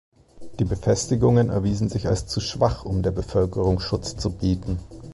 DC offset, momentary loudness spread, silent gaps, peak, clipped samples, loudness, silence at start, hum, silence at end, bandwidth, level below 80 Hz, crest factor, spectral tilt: under 0.1%; 9 LU; none; -6 dBFS; under 0.1%; -23 LUFS; 0.35 s; none; 0 s; 11.5 kHz; -36 dBFS; 16 dB; -6.5 dB/octave